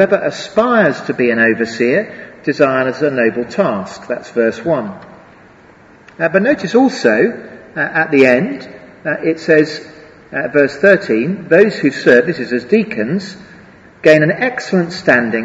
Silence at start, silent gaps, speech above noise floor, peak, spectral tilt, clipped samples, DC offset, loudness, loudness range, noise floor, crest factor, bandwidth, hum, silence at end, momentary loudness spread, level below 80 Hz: 0 s; none; 30 dB; 0 dBFS; -6 dB/octave; 0.1%; under 0.1%; -14 LUFS; 4 LU; -43 dBFS; 14 dB; 8 kHz; none; 0 s; 13 LU; -54 dBFS